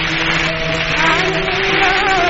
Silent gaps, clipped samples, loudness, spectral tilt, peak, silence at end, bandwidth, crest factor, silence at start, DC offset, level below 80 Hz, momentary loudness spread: none; under 0.1%; -14 LUFS; -1.5 dB/octave; -2 dBFS; 0 s; 8 kHz; 14 dB; 0 s; under 0.1%; -32 dBFS; 4 LU